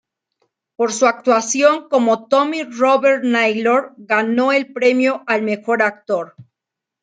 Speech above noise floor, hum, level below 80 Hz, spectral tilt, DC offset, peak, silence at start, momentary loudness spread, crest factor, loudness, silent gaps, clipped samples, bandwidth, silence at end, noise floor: 68 dB; none; -72 dBFS; -3 dB/octave; under 0.1%; -2 dBFS; 0.8 s; 7 LU; 16 dB; -16 LUFS; none; under 0.1%; 9.4 kHz; 0.6 s; -84 dBFS